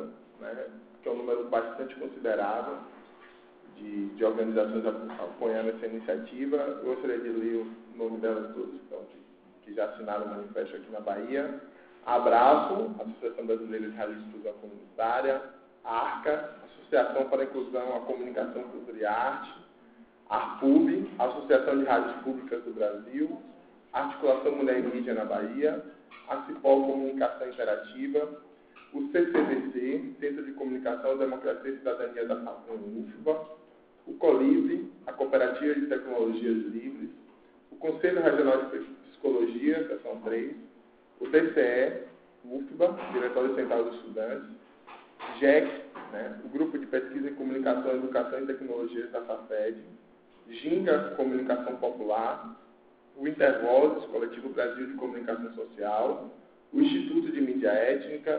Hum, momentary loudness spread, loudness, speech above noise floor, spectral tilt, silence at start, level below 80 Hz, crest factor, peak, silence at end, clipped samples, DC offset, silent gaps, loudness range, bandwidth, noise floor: none; 15 LU; -30 LUFS; 30 dB; -9 dB/octave; 0 s; -74 dBFS; 22 dB; -8 dBFS; 0 s; under 0.1%; under 0.1%; none; 5 LU; 4 kHz; -59 dBFS